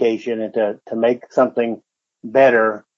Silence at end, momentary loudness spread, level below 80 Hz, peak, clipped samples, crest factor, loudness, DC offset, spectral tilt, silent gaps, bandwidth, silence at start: 0.2 s; 10 LU; -72 dBFS; -2 dBFS; under 0.1%; 16 dB; -18 LUFS; under 0.1%; -6.5 dB/octave; none; 7.4 kHz; 0 s